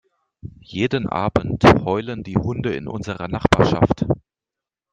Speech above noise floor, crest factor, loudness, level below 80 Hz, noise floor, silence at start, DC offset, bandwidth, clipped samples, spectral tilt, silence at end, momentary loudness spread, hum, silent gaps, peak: 69 dB; 20 dB; -20 LUFS; -40 dBFS; -88 dBFS; 0.45 s; under 0.1%; 9.6 kHz; under 0.1%; -7 dB/octave; 0.75 s; 13 LU; none; none; 0 dBFS